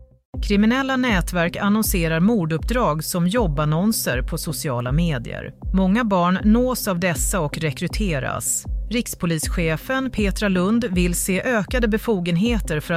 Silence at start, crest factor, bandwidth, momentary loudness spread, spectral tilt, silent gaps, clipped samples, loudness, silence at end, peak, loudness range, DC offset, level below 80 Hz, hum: 0 s; 14 dB; 16 kHz; 6 LU; -5 dB/octave; 0.25-0.33 s; under 0.1%; -21 LUFS; 0 s; -6 dBFS; 3 LU; under 0.1%; -30 dBFS; none